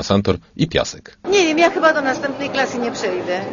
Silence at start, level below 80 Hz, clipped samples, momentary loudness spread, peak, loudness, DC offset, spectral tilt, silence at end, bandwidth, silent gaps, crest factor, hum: 0 s; -46 dBFS; under 0.1%; 9 LU; 0 dBFS; -18 LUFS; under 0.1%; -4.5 dB/octave; 0 s; 7.4 kHz; none; 18 dB; none